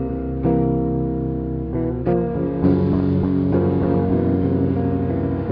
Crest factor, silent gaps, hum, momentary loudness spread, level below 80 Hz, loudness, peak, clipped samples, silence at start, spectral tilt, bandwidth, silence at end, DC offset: 14 dB; none; none; 5 LU; -34 dBFS; -20 LUFS; -6 dBFS; under 0.1%; 0 s; -12.5 dB/octave; 5.2 kHz; 0 s; under 0.1%